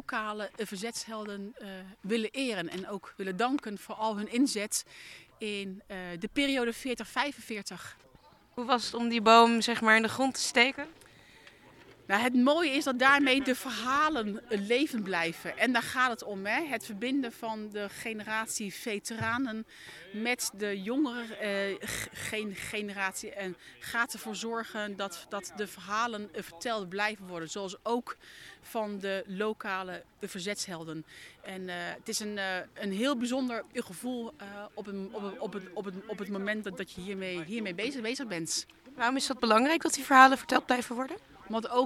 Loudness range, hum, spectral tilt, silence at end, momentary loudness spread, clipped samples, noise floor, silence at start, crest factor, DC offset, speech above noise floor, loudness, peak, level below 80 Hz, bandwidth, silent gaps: 11 LU; none; -3 dB/octave; 0 s; 16 LU; under 0.1%; -60 dBFS; 0.1 s; 26 dB; under 0.1%; 29 dB; -31 LUFS; -6 dBFS; -68 dBFS; 16.5 kHz; none